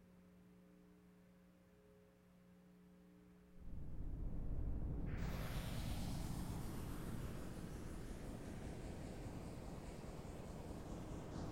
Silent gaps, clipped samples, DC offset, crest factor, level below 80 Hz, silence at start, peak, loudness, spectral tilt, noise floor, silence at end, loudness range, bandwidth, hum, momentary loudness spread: none; under 0.1%; under 0.1%; 16 dB; -52 dBFS; 0 s; -32 dBFS; -50 LUFS; -6 dB/octave; -68 dBFS; 0 s; 16 LU; 16 kHz; none; 21 LU